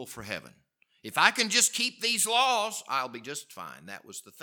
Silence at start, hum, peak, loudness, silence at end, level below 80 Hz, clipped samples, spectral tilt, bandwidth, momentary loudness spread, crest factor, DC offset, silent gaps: 0 s; none; -2 dBFS; -25 LUFS; 0 s; -72 dBFS; under 0.1%; 0 dB/octave; 19 kHz; 20 LU; 28 dB; under 0.1%; none